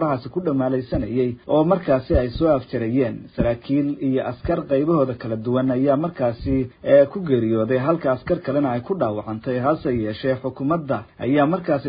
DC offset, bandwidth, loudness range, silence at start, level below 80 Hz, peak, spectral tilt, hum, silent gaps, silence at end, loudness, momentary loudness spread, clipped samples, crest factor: under 0.1%; 5.2 kHz; 2 LU; 0 s; -40 dBFS; -2 dBFS; -12.5 dB/octave; none; none; 0 s; -21 LUFS; 6 LU; under 0.1%; 18 dB